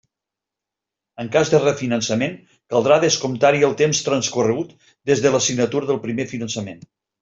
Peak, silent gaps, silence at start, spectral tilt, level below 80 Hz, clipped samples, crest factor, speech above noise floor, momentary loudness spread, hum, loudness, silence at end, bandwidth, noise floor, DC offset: -2 dBFS; none; 1.2 s; -4 dB/octave; -60 dBFS; under 0.1%; 18 dB; 67 dB; 11 LU; none; -19 LUFS; 0.45 s; 7.8 kHz; -86 dBFS; under 0.1%